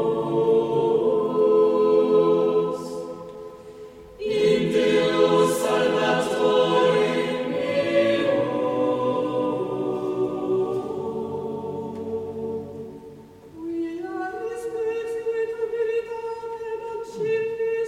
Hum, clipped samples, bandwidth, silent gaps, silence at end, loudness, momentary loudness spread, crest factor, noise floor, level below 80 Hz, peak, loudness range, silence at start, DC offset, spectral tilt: none; under 0.1%; 14 kHz; none; 0 s; -23 LUFS; 14 LU; 16 dB; -44 dBFS; -60 dBFS; -6 dBFS; 10 LU; 0 s; under 0.1%; -5.5 dB/octave